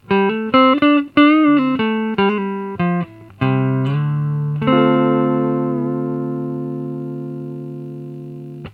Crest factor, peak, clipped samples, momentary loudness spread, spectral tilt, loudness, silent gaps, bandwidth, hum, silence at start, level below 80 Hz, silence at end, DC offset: 18 dB; 0 dBFS; under 0.1%; 17 LU; -9.5 dB/octave; -17 LUFS; none; 4.9 kHz; 50 Hz at -50 dBFS; 0.1 s; -56 dBFS; 0 s; under 0.1%